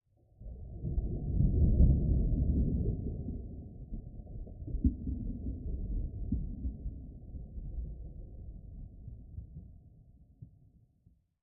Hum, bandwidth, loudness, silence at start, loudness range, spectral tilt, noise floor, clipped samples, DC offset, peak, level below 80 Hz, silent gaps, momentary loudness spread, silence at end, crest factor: none; 0.8 kHz; -35 LUFS; 0.4 s; 17 LU; -19 dB/octave; -68 dBFS; under 0.1%; under 0.1%; -12 dBFS; -36 dBFS; none; 21 LU; 1 s; 22 dB